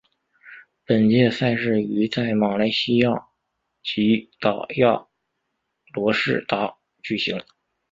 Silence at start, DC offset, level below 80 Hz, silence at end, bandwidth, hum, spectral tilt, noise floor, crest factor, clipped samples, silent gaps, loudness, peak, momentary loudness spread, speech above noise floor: 0.45 s; under 0.1%; -60 dBFS; 0.5 s; 7.6 kHz; none; -7 dB/octave; -77 dBFS; 20 dB; under 0.1%; none; -22 LUFS; -4 dBFS; 11 LU; 56 dB